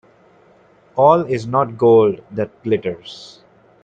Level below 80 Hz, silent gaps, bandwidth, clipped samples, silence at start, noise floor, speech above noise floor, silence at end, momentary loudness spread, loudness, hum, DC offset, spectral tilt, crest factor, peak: -60 dBFS; none; 7.8 kHz; under 0.1%; 0.95 s; -51 dBFS; 35 dB; 0.6 s; 17 LU; -17 LUFS; none; under 0.1%; -7.5 dB/octave; 18 dB; 0 dBFS